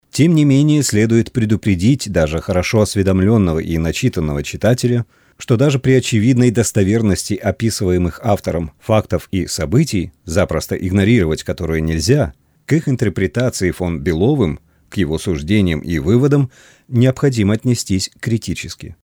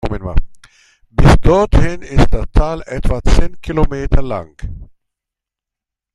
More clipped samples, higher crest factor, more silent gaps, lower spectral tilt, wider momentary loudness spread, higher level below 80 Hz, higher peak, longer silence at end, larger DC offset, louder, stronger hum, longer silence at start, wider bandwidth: neither; about the same, 14 dB vs 12 dB; neither; about the same, -6 dB/octave vs -7 dB/octave; second, 8 LU vs 13 LU; second, -36 dBFS vs -16 dBFS; about the same, -2 dBFS vs 0 dBFS; second, 0.1 s vs 1.3 s; neither; about the same, -16 LUFS vs -16 LUFS; neither; about the same, 0.15 s vs 0.05 s; first, 19.5 kHz vs 10.5 kHz